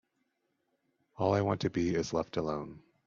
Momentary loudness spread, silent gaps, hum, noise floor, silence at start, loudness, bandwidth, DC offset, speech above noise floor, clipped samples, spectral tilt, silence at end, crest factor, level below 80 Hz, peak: 8 LU; none; none; -80 dBFS; 1.2 s; -32 LUFS; 7.6 kHz; under 0.1%; 48 dB; under 0.1%; -6.5 dB/octave; 0.3 s; 18 dB; -62 dBFS; -16 dBFS